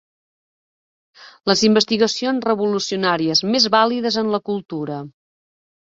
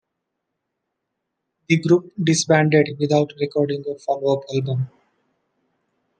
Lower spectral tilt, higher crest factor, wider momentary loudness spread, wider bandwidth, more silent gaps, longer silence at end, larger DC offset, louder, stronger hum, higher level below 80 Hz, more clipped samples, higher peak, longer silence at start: second, -4 dB/octave vs -5.5 dB/octave; about the same, 18 dB vs 20 dB; about the same, 11 LU vs 9 LU; second, 7.8 kHz vs 10 kHz; neither; second, 0.85 s vs 1.3 s; neither; about the same, -18 LUFS vs -20 LUFS; neither; about the same, -62 dBFS vs -66 dBFS; neither; about the same, -2 dBFS vs -2 dBFS; second, 1.2 s vs 1.7 s